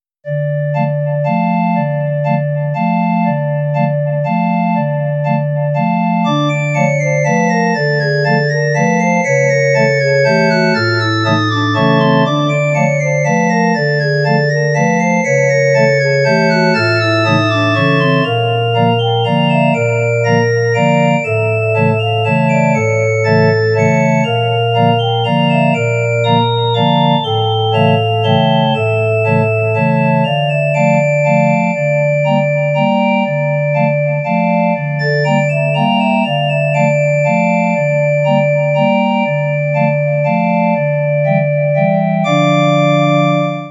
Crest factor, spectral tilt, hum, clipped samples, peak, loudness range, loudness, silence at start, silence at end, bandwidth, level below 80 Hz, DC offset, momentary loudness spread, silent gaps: 12 dB; -6.5 dB/octave; none; under 0.1%; 0 dBFS; 3 LU; -13 LUFS; 0.25 s; 0 s; 8.4 kHz; -64 dBFS; under 0.1%; 4 LU; none